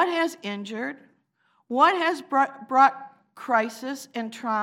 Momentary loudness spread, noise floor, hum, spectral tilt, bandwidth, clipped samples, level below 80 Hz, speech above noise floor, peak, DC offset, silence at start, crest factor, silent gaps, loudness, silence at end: 15 LU; -68 dBFS; none; -3.5 dB/octave; 16 kHz; under 0.1%; under -90 dBFS; 44 dB; -6 dBFS; under 0.1%; 0 s; 20 dB; none; -24 LUFS; 0 s